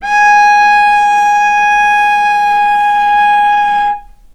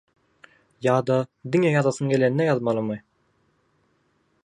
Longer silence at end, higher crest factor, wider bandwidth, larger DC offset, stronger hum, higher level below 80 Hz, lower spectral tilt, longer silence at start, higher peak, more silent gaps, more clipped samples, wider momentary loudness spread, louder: second, 0.35 s vs 1.45 s; second, 10 dB vs 18 dB; first, 12 kHz vs 10.5 kHz; neither; neither; first, -42 dBFS vs -68 dBFS; second, 0 dB/octave vs -7 dB/octave; second, 0 s vs 0.8 s; first, 0 dBFS vs -6 dBFS; neither; neither; second, 4 LU vs 7 LU; first, -9 LUFS vs -23 LUFS